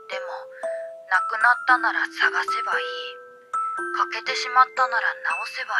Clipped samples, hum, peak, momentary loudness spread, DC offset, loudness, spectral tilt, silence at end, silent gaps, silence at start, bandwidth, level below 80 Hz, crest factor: under 0.1%; none; -4 dBFS; 13 LU; under 0.1%; -23 LUFS; 0 dB/octave; 0 s; none; 0 s; 12 kHz; -88 dBFS; 20 dB